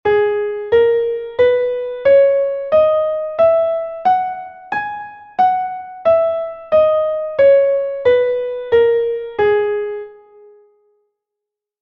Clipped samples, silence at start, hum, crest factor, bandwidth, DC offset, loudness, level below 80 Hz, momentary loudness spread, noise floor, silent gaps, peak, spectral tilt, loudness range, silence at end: under 0.1%; 0.05 s; none; 12 dB; 5.6 kHz; under 0.1%; -16 LUFS; -52 dBFS; 12 LU; -83 dBFS; none; -4 dBFS; -6.5 dB/octave; 4 LU; 1.7 s